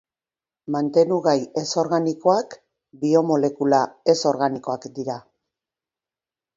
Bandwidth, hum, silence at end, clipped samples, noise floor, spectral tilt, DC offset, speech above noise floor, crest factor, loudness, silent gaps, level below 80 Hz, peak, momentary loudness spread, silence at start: 7.8 kHz; none; 1.35 s; under 0.1%; under -90 dBFS; -5.5 dB/octave; under 0.1%; over 69 dB; 18 dB; -21 LUFS; none; -70 dBFS; -4 dBFS; 12 LU; 0.7 s